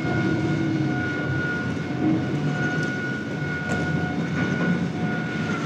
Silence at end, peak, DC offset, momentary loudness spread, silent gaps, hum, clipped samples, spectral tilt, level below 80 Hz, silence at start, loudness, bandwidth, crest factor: 0 s; -12 dBFS; under 0.1%; 4 LU; none; none; under 0.1%; -7 dB/octave; -54 dBFS; 0 s; -25 LUFS; 9.2 kHz; 12 dB